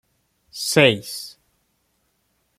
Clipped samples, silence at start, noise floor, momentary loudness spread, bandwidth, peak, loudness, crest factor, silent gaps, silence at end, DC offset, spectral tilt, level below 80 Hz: under 0.1%; 0.55 s; -69 dBFS; 23 LU; 16.5 kHz; -2 dBFS; -19 LUFS; 22 dB; none; 1.3 s; under 0.1%; -3.5 dB/octave; -64 dBFS